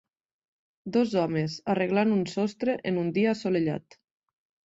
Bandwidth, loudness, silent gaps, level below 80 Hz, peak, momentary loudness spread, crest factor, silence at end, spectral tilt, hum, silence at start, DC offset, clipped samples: 8 kHz; -27 LUFS; none; -68 dBFS; -12 dBFS; 5 LU; 16 dB; 0.9 s; -7 dB/octave; none; 0.85 s; under 0.1%; under 0.1%